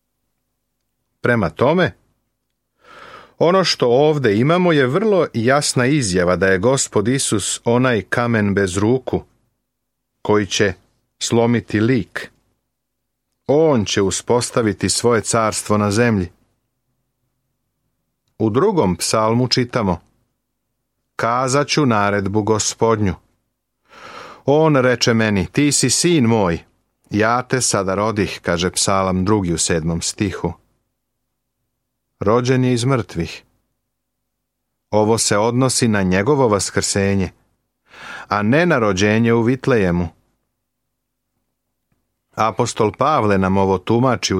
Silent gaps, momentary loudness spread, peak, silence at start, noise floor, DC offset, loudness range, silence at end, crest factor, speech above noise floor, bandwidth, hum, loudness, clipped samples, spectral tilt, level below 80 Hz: none; 8 LU; -2 dBFS; 1.25 s; -76 dBFS; under 0.1%; 6 LU; 0 s; 16 dB; 60 dB; 15 kHz; none; -17 LUFS; under 0.1%; -4.5 dB/octave; -48 dBFS